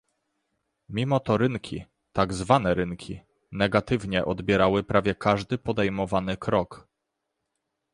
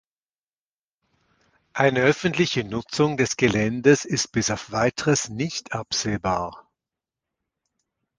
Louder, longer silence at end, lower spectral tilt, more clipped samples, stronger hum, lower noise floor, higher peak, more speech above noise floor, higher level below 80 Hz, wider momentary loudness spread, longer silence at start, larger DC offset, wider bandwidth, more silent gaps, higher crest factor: second, -25 LUFS vs -22 LUFS; second, 1.15 s vs 1.6 s; first, -6.5 dB/octave vs -4.5 dB/octave; neither; neither; second, -81 dBFS vs under -90 dBFS; about the same, -4 dBFS vs -2 dBFS; second, 57 dB vs over 68 dB; about the same, -48 dBFS vs -52 dBFS; first, 15 LU vs 9 LU; second, 0.9 s vs 1.75 s; neither; about the same, 11 kHz vs 10.5 kHz; neither; about the same, 22 dB vs 22 dB